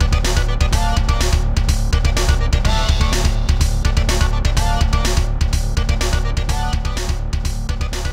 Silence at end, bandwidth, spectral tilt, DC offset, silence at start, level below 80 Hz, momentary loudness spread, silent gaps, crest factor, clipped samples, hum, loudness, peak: 0 s; 15.5 kHz; -4.5 dB/octave; under 0.1%; 0 s; -16 dBFS; 5 LU; none; 14 dB; under 0.1%; none; -19 LUFS; -2 dBFS